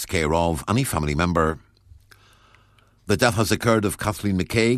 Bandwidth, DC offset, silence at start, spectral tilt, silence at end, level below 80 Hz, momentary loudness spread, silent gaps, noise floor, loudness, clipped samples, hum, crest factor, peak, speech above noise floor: 14 kHz; under 0.1%; 0 s; -5 dB/octave; 0 s; -40 dBFS; 6 LU; none; -57 dBFS; -22 LUFS; under 0.1%; none; 22 dB; -2 dBFS; 36 dB